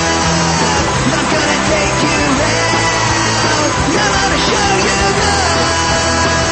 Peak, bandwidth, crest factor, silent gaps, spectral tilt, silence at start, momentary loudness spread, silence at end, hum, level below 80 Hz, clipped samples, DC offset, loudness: 0 dBFS; 8.8 kHz; 12 dB; none; -3 dB/octave; 0 s; 1 LU; 0 s; none; -28 dBFS; under 0.1%; under 0.1%; -12 LUFS